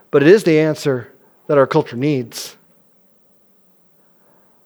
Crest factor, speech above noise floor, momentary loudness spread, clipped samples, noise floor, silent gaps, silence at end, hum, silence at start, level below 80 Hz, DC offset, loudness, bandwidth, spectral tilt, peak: 18 dB; 40 dB; 17 LU; under 0.1%; -54 dBFS; none; 2.15 s; none; 0.15 s; -70 dBFS; under 0.1%; -15 LUFS; over 20 kHz; -6.5 dB/octave; 0 dBFS